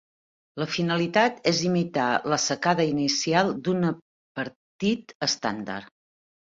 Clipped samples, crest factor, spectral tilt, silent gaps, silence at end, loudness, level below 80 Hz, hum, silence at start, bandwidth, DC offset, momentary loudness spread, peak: under 0.1%; 20 dB; -4 dB/octave; 4.02-4.35 s, 4.56-4.79 s, 5.15-5.20 s; 0.7 s; -25 LUFS; -64 dBFS; none; 0.55 s; 7.8 kHz; under 0.1%; 12 LU; -6 dBFS